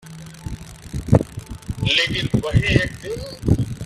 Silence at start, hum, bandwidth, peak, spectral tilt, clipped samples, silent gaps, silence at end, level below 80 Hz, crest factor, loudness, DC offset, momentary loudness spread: 0.05 s; none; 13.5 kHz; 0 dBFS; -5.5 dB/octave; under 0.1%; none; 0 s; -34 dBFS; 20 dB; -20 LUFS; under 0.1%; 17 LU